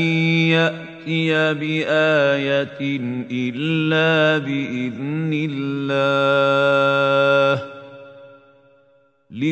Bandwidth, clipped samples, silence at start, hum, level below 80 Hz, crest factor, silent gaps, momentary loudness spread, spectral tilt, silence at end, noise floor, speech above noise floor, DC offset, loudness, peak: 8.4 kHz; under 0.1%; 0 s; none; -68 dBFS; 16 dB; none; 9 LU; -6.5 dB/octave; 0 s; -57 dBFS; 39 dB; under 0.1%; -19 LUFS; -4 dBFS